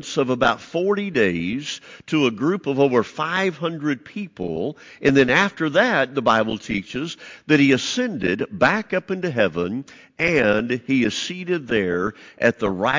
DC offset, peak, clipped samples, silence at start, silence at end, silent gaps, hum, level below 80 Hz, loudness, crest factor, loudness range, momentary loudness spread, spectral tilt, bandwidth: under 0.1%; -4 dBFS; under 0.1%; 0 s; 0 s; none; none; -52 dBFS; -21 LUFS; 16 dB; 2 LU; 11 LU; -5 dB/octave; 7.6 kHz